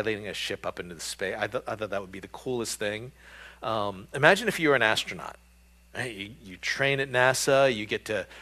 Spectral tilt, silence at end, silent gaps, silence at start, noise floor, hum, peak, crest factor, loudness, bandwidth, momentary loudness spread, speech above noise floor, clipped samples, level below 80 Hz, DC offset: -3.5 dB/octave; 0 s; none; 0 s; -57 dBFS; none; -2 dBFS; 26 dB; -27 LUFS; 15 kHz; 17 LU; 29 dB; under 0.1%; -58 dBFS; under 0.1%